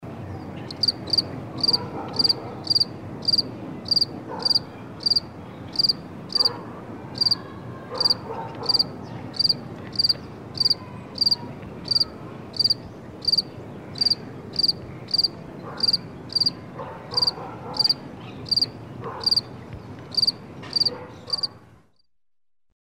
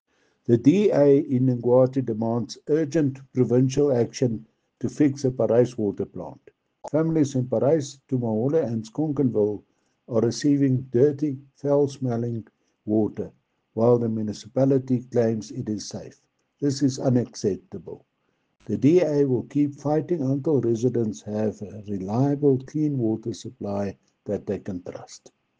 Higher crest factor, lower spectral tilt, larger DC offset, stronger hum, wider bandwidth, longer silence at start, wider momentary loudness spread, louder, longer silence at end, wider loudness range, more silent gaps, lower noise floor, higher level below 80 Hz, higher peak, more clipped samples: about the same, 18 dB vs 18 dB; second, -3.5 dB/octave vs -7.5 dB/octave; neither; neither; first, 15.5 kHz vs 9.4 kHz; second, 0 s vs 0.5 s; about the same, 16 LU vs 14 LU; about the same, -22 LUFS vs -24 LUFS; first, 1.1 s vs 0.45 s; about the same, 2 LU vs 4 LU; neither; first, -87 dBFS vs -72 dBFS; first, -56 dBFS vs -64 dBFS; second, -10 dBFS vs -6 dBFS; neither